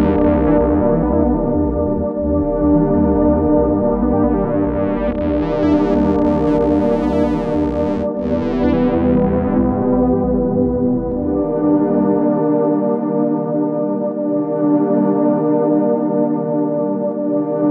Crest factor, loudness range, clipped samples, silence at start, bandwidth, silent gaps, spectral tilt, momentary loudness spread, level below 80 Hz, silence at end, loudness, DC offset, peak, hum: 12 dB; 1 LU; under 0.1%; 0 s; 5 kHz; none; -10.5 dB/octave; 5 LU; -30 dBFS; 0 s; -16 LUFS; under 0.1%; -2 dBFS; none